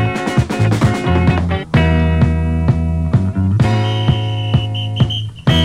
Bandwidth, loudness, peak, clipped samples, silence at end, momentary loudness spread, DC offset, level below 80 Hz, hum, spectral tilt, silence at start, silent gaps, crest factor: 11 kHz; -15 LUFS; -2 dBFS; under 0.1%; 0 s; 3 LU; under 0.1%; -24 dBFS; none; -7 dB/octave; 0 s; none; 12 dB